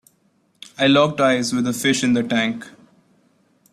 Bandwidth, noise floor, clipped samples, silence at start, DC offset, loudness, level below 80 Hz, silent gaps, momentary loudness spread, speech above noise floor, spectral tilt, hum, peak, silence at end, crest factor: 15 kHz; -63 dBFS; under 0.1%; 0.8 s; under 0.1%; -18 LUFS; -62 dBFS; none; 9 LU; 44 dB; -4 dB/octave; none; -4 dBFS; 1.05 s; 18 dB